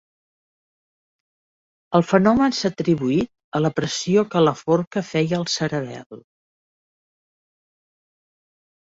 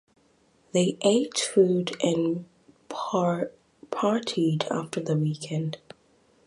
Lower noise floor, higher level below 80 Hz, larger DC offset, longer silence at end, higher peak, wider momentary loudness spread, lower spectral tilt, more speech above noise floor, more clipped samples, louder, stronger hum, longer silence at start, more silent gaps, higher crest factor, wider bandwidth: first, under -90 dBFS vs -63 dBFS; first, -56 dBFS vs -70 dBFS; neither; first, 2.65 s vs 0.7 s; first, -2 dBFS vs -8 dBFS; second, 8 LU vs 12 LU; about the same, -5.5 dB/octave vs -5.5 dB/octave; first, over 70 dB vs 38 dB; neither; first, -20 LUFS vs -26 LUFS; neither; first, 1.9 s vs 0.75 s; first, 3.44-3.52 s, 4.87-4.91 s, 6.06-6.10 s vs none; about the same, 20 dB vs 18 dB; second, 8 kHz vs 11.5 kHz